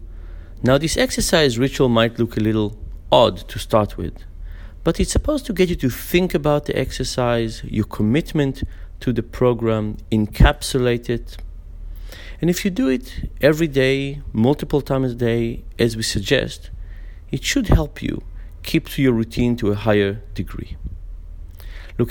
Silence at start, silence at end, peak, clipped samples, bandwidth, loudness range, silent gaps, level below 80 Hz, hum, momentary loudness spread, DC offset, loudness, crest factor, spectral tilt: 0 s; 0 s; 0 dBFS; under 0.1%; 19.5 kHz; 3 LU; none; -30 dBFS; none; 21 LU; under 0.1%; -20 LUFS; 20 dB; -5.5 dB/octave